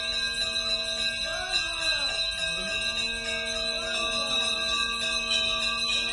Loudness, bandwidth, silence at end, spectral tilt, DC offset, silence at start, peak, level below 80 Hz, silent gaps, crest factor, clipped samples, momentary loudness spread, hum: -26 LUFS; 11.5 kHz; 0 s; -0.5 dB/octave; under 0.1%; 0 s; -12 dBFS; -48 dBFS; none; 16 dB; under 0.1%; 3 LU; none